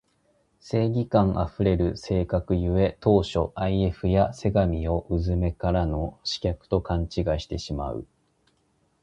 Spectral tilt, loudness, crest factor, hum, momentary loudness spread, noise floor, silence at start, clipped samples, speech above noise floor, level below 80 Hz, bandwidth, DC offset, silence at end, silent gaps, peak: -7.5 dB/octave; -25 LUFS; 20 dB; none; 7 LU; -68 dBFS; 0.65 s; under 0.1%; 44 dB; -36 dBFS; 8.8 kHz; under 0.1%; 1 s; none; -6 dBFS